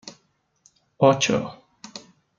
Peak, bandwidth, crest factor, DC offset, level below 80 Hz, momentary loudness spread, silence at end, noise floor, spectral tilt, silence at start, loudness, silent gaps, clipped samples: -2 dBFS; 7.6 kHz; 24 dB; under 0.1%; -64 dBFS; 25 LU; 0.4 s; -66 dBFS; -4.5 dB/octave; 0.05 s; -20 LUFS; none; under 0.1%